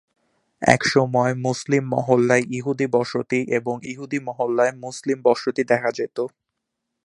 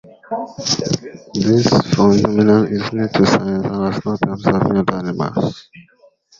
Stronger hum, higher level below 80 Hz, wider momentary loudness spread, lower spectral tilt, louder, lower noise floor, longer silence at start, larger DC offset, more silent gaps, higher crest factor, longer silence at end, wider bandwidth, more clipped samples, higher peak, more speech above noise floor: neither; second, -58 dBFS vs -46 dBFS; about the same, 11 LU vs 11 LU; about the same, -5.5 dB/octave vs -6 dB/octave; second, -21 LUFS vs -17 LUFS; first, -80 dBFS vs -52 dBFS; first, 0.6 s vs 0.3 s; neither; neither; first, 22 dB vs 16 dB; first, 0.75 s vs 0.6 s; first, 11.5 kHz vs 7.6 kHz; neither; about the same, 0 dBFS vs 0 dBFS; first, 59 dB vs 36 dB